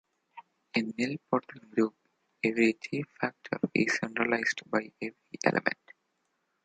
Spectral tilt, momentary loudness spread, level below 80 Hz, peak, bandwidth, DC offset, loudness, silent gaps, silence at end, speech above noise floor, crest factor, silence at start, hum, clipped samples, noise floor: -5 dB/octave; 8 LU; -74 dBFS; -6 dBFS; 9.2 kHz; under 0.1%; -31 LUFS; none; 0.9 s; 47 dB; 26 dB; 0.35 s; none; under 0.1%; -78 dBFS